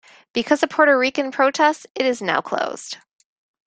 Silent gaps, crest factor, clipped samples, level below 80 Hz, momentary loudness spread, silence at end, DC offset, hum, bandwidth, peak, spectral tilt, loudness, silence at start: 1.90-1.95 s; 20 dB; under 0.1%; -68 dBFS; 12 LU; 0.7 s; under 0.1%; none; 9.4 kHz; -2 dBFS; -3 dB/octave; -19 LUFS; 0.35 s